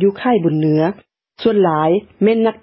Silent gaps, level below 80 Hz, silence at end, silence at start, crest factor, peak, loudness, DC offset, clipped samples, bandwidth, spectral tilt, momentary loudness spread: none; -56 dBFS; 0.1 s; 0 s; 12 dB; -2 dBFS; -16 LUFS; under 0.1%; under 0.1%; 5.8 kHz; -12.5 dB/octave; 6 LU